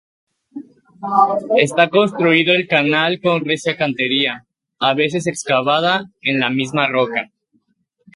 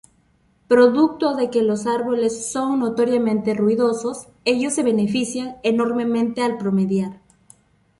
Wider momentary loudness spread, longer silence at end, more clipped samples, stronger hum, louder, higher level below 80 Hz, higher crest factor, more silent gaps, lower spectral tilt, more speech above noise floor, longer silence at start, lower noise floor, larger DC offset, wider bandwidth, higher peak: first, 12 LU vs 8 LU; about the same, 0.9 s vs 0.85 s; neither; neither; first, -16 LUFS vs -20 LUFS; about the same, -64 dBFS vs -60 dBFS; about the same, 18 dB vs 18 dB; neither; about the same, -4.5 dB/octave vs -5.5 dB/octave; first, 49 dB vs 41 dB; second, 0.55 s vs 0.7 s; first, -66 dBFS vs -60 dBFS; neither; about the same, 11.5 kHz vs 11.5 kHz; about the same, 0 dBFS vs -2 dBFS